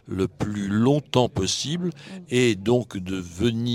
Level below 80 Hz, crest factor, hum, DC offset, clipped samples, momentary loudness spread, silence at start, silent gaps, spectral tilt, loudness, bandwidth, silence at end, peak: -54 dBFS; 20 dB; none; under 0.1%; under 0.1%; 10 LU; 0.05 s; none; -5.5 dB/octave; -24 LUFS; 15.5 kHz; 0 s; -4 dBFS